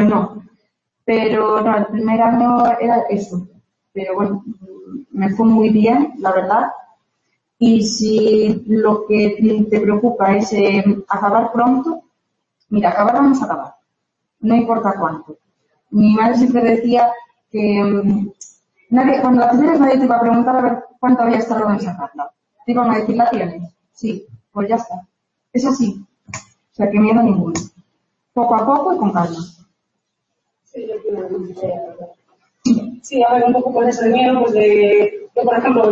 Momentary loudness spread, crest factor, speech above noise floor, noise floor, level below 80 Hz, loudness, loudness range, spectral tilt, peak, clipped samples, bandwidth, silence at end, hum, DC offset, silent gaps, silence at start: 15 LU; 14 dB; 60 dB; -74 dBFS; -56 dBFS; -16 LUFS; 6 LU; -6.5 dB/octave; -2 dBFS; under 0.1%; 7.8 kHz; 0 s; none; under 0.1%; none; 0 s